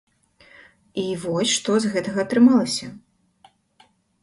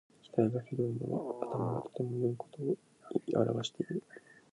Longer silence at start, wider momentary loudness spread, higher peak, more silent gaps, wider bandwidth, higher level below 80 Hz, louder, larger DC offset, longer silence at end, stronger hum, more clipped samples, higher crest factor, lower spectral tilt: first, 0.95 s vs 0.25 s; first, 13 LU vs 7 LU; first, -4 dBFS vs -14 dBFS; neither; about the same, 11.5 kHz vs 11 kHz; first, -64 dBFS vs -74 dBFS; first, -21 LUFS vs -36 LUFS; neither; first, 1.25 s vs 0.2 s; neither; neither; about the same, 18 dB vs 22 dB; second, -4 dB/octave vs -7.5 dB/octave